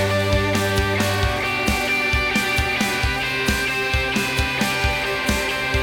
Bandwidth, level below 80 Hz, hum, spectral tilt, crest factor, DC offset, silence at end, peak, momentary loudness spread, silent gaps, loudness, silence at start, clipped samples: 18 kHz; -30 dBFS; none; -4 dB/octave; 16 dB; under 0.1%; 0 s; -4 dBFS; 2 LU; none; -20 LUFS; 0 s; under 0.1%